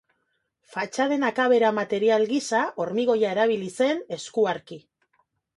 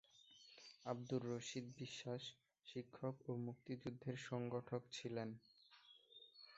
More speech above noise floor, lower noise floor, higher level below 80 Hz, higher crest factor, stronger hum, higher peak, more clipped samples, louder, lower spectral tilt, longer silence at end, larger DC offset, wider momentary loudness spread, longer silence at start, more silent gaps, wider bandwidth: first, 51 dB vs 21 dB; first, -75 dBFS vs -69 dBFS; first, -72 dBFS vs -84 dBFS; about the same, 16 dB vs 20 dB; neither; first, -8 dBFS vs -30 dBFS; neither; first, -24 LUFS vs -49 LUFS; about the same, -4.5 dB/octave vs -5.5 dB/octave; first, 0.75 s vs 0 s; neither; second, 11 LU vs 18 LU; first, 0.7 s vs 0.15 s; neither; first, 11.5 kHz vs 8 kHz